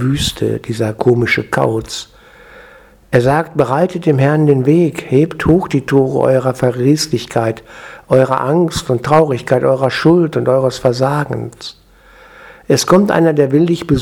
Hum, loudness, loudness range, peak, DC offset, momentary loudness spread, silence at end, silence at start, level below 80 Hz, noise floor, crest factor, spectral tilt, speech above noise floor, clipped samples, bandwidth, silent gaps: none; -13 LUFS; 3 LU; 0 dBFS; under 0.1%; 8 LU; 0 s; 0 s; -40 dBFS; -43 dBFS; 14 dB; -6 dB/octave; 30 dB; under 0.1%; 17 kHz; none